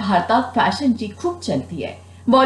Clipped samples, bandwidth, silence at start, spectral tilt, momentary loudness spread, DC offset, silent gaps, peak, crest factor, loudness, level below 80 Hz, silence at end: under 0.1%; 11.5 kHz; 0 s; -5.5 dB/octave; 12 LU; under 0.1%; none; -4 dBFS; 14 dB; -20 LUFS; -58 dBFS; 0 s